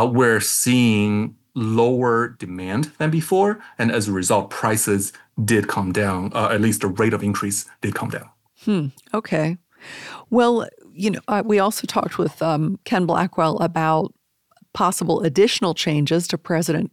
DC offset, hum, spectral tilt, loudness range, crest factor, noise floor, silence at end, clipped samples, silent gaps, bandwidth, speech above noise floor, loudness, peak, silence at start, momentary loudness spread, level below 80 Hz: under 0.1%; none; -5 dB/octave; 3 LU; 16 dB; -59 dBFS; 0.05 s; under 0.1%; none; 16 kHz; 39 dB; -20 LUFS; -4 dBFS; 0 s; 10 LU; -60 dBFS